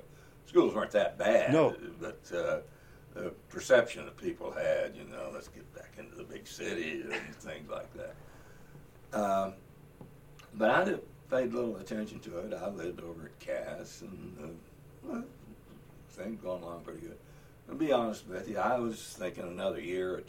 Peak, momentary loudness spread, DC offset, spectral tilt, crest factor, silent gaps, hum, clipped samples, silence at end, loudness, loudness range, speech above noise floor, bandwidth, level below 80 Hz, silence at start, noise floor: -12 dBFS; 22 LU; under 0.1%; -5.5 dB/octave; 24 dB; none; none; under 0.1%; 0 s; -33 LUFS; 13 LU; 21 dB; 16.5 kHz; -62 dBFS; 0 s; -55 dBFS